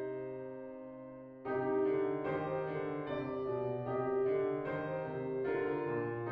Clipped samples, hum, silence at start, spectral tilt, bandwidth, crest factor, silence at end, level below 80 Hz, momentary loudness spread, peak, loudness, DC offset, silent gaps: under 0.1%; none; 0 s; -7 dB/octave; 4.7 kHz; 12 dB; 0 s; -70 dBFS; 13 LU; -24 dBFS; -37 LUFS; under 0.1%; none